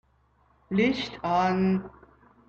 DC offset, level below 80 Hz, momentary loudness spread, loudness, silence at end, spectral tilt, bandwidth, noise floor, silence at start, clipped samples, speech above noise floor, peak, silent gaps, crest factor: under 0.1%; -56 dBFS; 7 LU; -26 LUFS; 0.6 s; -7 dB/octave; 7 kHz; -65 dBFS; 0.7 s; under 0.1%; 39 dB; -12 dBFS; none; 16 dB